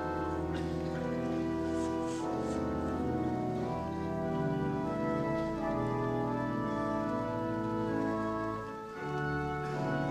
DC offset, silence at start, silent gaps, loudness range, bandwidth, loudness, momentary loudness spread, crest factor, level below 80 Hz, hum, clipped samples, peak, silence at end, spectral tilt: under 0.1%; 0 s; none; 1 LU; 13 kHz; -34 LUFS; 3 LU; 12 dB; -50 dBFS; none; under 0.1%; -20 dBFS; 0 s; -7.5 dB/octave